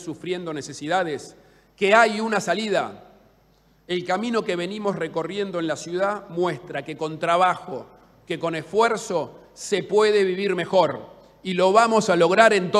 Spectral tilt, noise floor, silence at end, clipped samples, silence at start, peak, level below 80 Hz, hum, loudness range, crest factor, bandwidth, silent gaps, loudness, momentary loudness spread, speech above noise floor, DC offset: -4.5 dB/octave; -59 dBFS; 0 s; under 0.1%; 0 s; -4 dBFS; -66 dBFS; none; 5 LU; 18 dB; 13 kHz; none; -22 LUFS; 15 LU; 37 dB; under 0.1%